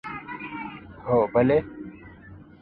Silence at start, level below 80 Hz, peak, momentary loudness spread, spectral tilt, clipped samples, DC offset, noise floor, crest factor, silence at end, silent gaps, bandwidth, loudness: 0.05 s; -52 dBFS; -8 dBFS; 21 LU; -10 dB/octave; under 0.1%; under 0.1%; -46 dBFS; 18 dB; 0.2 s; none; 5 kHz; -25 LUFS